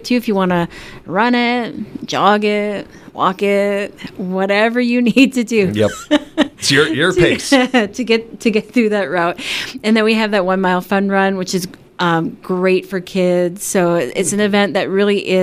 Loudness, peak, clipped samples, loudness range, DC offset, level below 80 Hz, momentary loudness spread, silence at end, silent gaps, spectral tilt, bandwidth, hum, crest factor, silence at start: -15 LUFS; 0 dBFS; under 0.1%; 3 LU; under 0.1%; -48 dBFS; 9 LU; 0 s; none; -4.5 dB/octave; 16 kHz; none; 16 dB; 0 s